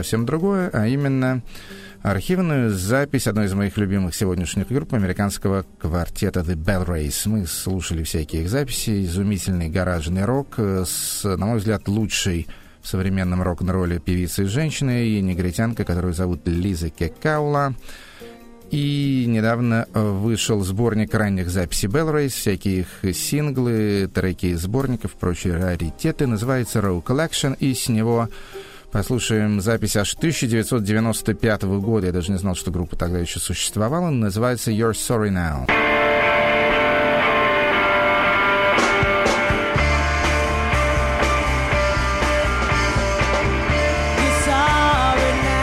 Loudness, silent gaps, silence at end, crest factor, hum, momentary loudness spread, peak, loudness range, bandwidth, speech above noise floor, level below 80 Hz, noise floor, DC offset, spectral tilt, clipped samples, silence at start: -20 LUFS; none; 0 s; 14 dB; none; 8 LU; -6 dBFS; 6 LU; 16 kHz; 20 dB; -32 dBFS; -40 dBFS; under 0.1%; -5 dB/octave; under 0.1%; 0 s